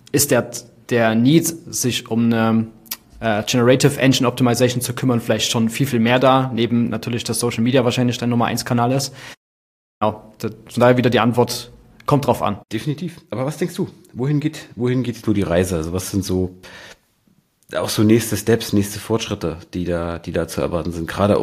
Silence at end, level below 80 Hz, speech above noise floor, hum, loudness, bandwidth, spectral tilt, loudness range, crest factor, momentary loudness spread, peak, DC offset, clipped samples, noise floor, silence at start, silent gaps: 0 s; -48 dBFS; 42 dB; none; -19 LUFS; 15.5 kHz; -5 dB/octave; 5 LU; 18 dB; 12 LU; 0 dBFS; under 0.1%; under 0.1%; -60 dBFS; 0.15 s; 9.37-10.01 s